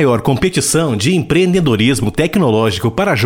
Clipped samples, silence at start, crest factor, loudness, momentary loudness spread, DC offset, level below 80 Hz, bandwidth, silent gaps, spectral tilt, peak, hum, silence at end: under 0.1%; 0 s; 12 dB; -13 LUFS; 3 LU; 0.2%; -36 dBFS; 17 kHz; none; -5 dB/octave; -2 dBFS; none; 0 s